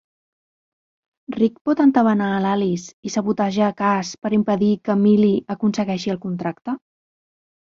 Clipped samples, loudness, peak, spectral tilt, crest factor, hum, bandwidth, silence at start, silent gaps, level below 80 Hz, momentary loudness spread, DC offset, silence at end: under 0.1%; -20 LUFS; -4 dBFS; -6.5 dB/octave; 18 dB; none; 7.6 kHz; 1.3 s; 1.61-1.65 s, 2.94-3.03 s; -62 dBFS; 11 LU; under 0.1%; 0.95 s